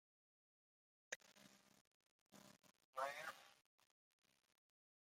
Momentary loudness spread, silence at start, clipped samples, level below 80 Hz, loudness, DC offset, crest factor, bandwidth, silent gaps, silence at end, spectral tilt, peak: 20 LU; 1.1 s; under 0.1%; under -90 dBFS; -52 LUFS; under 0.1%; 26 dB; 16 kHz; 1.16-1.20 s, 1.81-2.26 s, 2.85-2.93 s; 1.5 s; -1 dB/octave; -32 dBFS